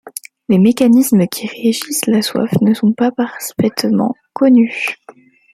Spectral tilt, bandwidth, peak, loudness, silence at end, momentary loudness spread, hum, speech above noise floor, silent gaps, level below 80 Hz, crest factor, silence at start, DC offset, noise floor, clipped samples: -5.5 dB/octave; 15.5 kHz; 0 dBFS; -14 LUFS; 0.6 s; 10 LU; none; 30 dB; none; -56 dBFS; 14 dB; 0.05 s; under 0.1%; -43 dBFS; under 0.1%